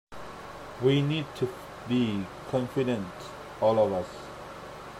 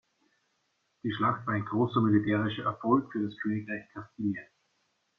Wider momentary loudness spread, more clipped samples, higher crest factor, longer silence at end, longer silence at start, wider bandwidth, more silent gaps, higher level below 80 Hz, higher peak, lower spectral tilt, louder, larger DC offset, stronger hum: first, 17 LU vs 13 LU; neither; about the same, 18 dB vs 20 dB; second, 0 s vs 0.75 s; second, 0.1 s vs 1.05 s; first, 15 kHz vs 5.6 kHz; neither; first, -58 dBFS vs -66 dBFS; about the same, -12 dBFS vs -12 dBFS; second, -7 dB/octave vs -9 dB/octave; about the same, -29 LUFS vs -30 LUFS; neither; neither